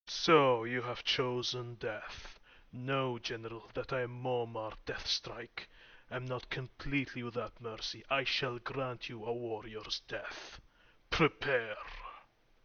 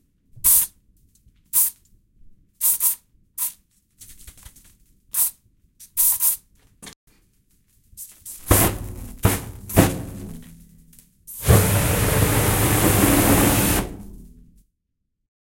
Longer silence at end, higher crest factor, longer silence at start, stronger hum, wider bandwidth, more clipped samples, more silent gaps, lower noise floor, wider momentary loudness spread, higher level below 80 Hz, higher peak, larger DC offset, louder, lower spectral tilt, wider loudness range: second, 0.45 s vs 1.3 s; about the same, 24 dB vs 22 dB; second, 0.05 s vs 0.35 s; neither; second, 6.8 kHz vs 17 kHz; neither; second, none vs 6.96-7.07 s; second, -60 dBFS vs -76 dBFS; second, 16 LU vs 20 LU; second, -58 dBFS vs -36 dBFS; second, -12 dBFS vs 0 dBFS; neither; second, -36 LUFS vs -19 LUFS; about the same, -3 dB/octave vs -4 dB/octave; second, 3 LU vs 7 LU